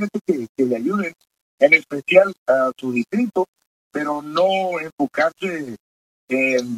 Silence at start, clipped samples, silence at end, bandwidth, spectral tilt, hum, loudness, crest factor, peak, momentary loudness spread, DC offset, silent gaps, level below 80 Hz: 0 s; under 0.1%; 0 s; 14 kHz; -5.5 dB/octave; none; -20 LUFS; 20 dB; 0 dBFS; 12 LU; under 0.1%; 0.49-0.55 s, 1.41-1.58 s, 2.38-2.46 s, 3.48-3.53 s, 3.67-3.91 s, 4.92-4.98 s, 5.80-6.28 s; -70 dBFS